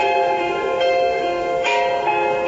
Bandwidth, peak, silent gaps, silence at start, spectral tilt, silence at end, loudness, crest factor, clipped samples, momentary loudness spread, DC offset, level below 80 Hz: 8 kHz; -6 dBFS; none; 0 s; -3.5 dB/octave; 0 s; -19 LUFS; 12 dB; under 0.1%; 3 LU; under 0.1%; -52 dBFS